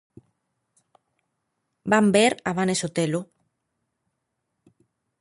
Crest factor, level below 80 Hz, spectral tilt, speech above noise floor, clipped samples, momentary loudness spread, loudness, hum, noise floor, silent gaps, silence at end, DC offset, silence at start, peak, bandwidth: 22 dB; -66 dBFS; -4.5 dB/octave; 58 dB; under 0.1%; 10 LU; -22 LUFS; none; -79 dBFS; none; 1.95 s; under 0.1%; 1.85 s; -6 dBFS; 11.5 kHz